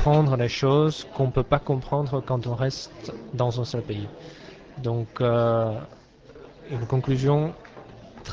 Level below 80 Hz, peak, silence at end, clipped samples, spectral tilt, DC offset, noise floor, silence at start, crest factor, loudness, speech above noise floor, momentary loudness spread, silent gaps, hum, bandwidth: -42 dBFS; -8 dBFS; 0 s; under 0.1%; -7.5 dB/octave; under 0.1%; -47 dBFS; 0 s; 18 dB; -25 LUFS; 24 dB; 22 LU; none; none; 7.6 kHz